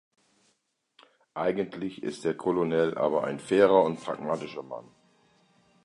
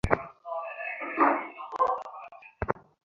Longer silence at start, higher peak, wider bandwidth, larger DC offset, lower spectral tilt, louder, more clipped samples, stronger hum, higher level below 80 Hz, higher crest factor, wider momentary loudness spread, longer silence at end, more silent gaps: first, 1.35 s vs 0.05 s; second, -8 dBFS vs -2 dBFS; about the same, 11 kHz vs 11.5 kHz; neither; about the same, -6.5 dB/octave vs -7.5 dB/octave; first, -27 LUFS vs -30 LUFS; neither; neither; second, -68 dBFS vs -48 dBFS; second, 22 dB vs 28 dB; about the same, 17 LU vs 15 LU; first, 1.05 s vs 0.25 s; neither